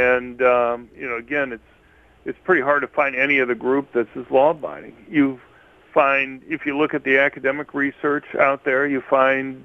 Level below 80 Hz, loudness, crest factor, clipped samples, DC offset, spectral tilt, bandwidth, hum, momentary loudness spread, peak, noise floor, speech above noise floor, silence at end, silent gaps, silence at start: -58 dBFS; -20 LUFS; 20 dB; under 0.1%; under 0.1%; -7 dB/octave; 6.2 kHz; none; 11 LU; -2 dBFS; -53 dBFS; 33 dB; 0 s; none; 0 s